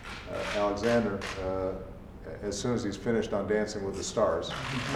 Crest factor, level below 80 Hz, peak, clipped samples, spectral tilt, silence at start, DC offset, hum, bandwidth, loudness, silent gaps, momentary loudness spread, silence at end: 18 dB; -48 dBFS; -14 dBFS; under 0.1%; -5 dB/octave; 0 s; under 0.1%; none; 14.5 kHz; -31 LUFS; none; 11 LU; 0 s